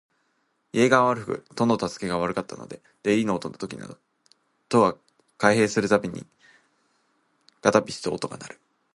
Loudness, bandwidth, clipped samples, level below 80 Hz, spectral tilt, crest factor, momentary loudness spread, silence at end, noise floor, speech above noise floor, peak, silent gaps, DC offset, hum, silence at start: -24 LUFS; 11.5 kHz; under 0.1%; -62 dBFS; -5 dB/octave; 24 dB; 20 LU; 0.45 s; -71 dBFS; 47 dB; -2 dBFS; none; under 0.1%; none; 0.75 s